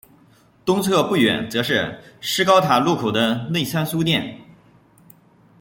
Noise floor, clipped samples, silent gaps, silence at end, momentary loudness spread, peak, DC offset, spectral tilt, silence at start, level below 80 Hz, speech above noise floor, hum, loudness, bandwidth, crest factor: -54 dBFS; under 0.1%; none; 1.2 s; 9 LU; -2 dBFS; under 0.1%; -4.5 dB/octave; 0.65 s; -58 dBFS; 34 dB; none; -19 LUFS; 17 kHz; 20 dB